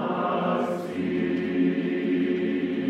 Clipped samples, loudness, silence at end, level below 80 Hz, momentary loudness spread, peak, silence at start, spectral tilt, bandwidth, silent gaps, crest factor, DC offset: under 0.1%; -26 LUFS; 0 s; -68 dBFS; 3 LU; -12 dBFS; 0 s; -8 dB/octave; 8.6 kHz; none; 12 dB; under 0.1%